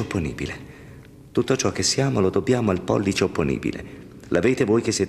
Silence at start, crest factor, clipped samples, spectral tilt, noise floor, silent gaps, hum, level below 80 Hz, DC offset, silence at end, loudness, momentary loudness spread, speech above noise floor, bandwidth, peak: 0 s; 16 dB; under 0.1%; -5 dB/octave; -44 dBFS; none; none; -48 dBFS; under 0.1%; 0 s; -22 LUFS; 15 LU; 22 dB; 13.5 kHz; -6 dBFS